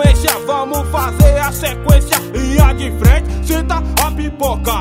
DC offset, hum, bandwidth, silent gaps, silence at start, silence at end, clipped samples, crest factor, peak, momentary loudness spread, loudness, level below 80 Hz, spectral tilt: under 0.1%; none; 16.5 kHz; none; 0 s; 0 s; 0.3%; 12 dB; 0 dBFS; 6 LU; -14 LUFS; -16 dBFS; -5 dB/octave